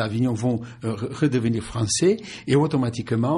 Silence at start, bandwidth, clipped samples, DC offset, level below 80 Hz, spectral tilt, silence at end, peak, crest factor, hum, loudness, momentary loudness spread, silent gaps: 0 s; 11.5 kHz; under 0.1%; under 0.1%; -52 dBFS; -5.5 dB/octave; 0 s; -8 dBFS; 16 dB; none; -23 LUFS; 8 LU; none